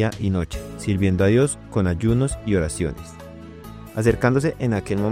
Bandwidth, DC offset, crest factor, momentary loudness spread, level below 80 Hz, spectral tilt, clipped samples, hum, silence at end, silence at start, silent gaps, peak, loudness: 15.5 kHz; 0.1%; 18 dB; 21 LU; -38 dBFS; -6.5 dB/octave; under 0.1%; none; 0 s; 0 s; none; -4 dBFS; -22 LUFS